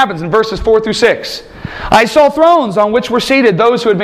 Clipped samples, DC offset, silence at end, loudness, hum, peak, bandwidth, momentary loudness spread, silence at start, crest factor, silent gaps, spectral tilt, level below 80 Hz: 0.2%; under 0.1%; 0 s; -10 LUFS; none; 0 dBFS; 15 kHz; 12 LU; 0 s; 10 dB; none; -5 dB/octave; -34 dBFS